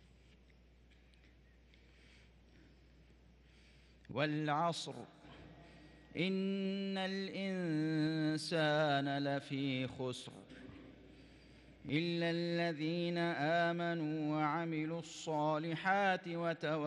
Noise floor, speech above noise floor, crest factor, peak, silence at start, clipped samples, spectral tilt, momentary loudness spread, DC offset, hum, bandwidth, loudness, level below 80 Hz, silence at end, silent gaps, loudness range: -65 dBFS; 28 dB; 18 dB; -22 dBFS; 4.1 s; under 0.1%; -6 dB/octave; 20 LU; under 0.1%; none; 11.5 kHz; -37 LUFS; -70 dBFS; 0 s; none; 6 LU